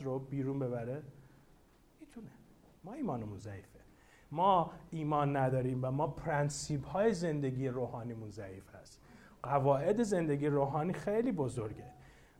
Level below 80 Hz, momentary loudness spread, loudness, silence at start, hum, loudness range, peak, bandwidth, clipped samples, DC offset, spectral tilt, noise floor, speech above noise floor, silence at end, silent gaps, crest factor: -62 dBFS; 21 LU; -35 LUFS; 0 s; none; 9 LU; -16 dBFS; 12.5 kHz; under 0.1%; under 0.1%; -7 dB/octave; -65 dBFS; 30 dB; 0.3 s; none; 18 dB